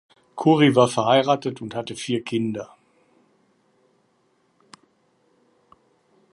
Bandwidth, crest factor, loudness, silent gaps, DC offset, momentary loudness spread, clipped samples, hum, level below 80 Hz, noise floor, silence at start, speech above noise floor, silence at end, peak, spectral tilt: 11.5 kHz; 22 dB; -21 LUFS; none; under 0.1%; 16 LU; under 0.1%; none; -68 dBFS; -65 dBFS; 0.35 s; 45 dB; 3.65 s; -4 dBFS; -5.5 dB/octave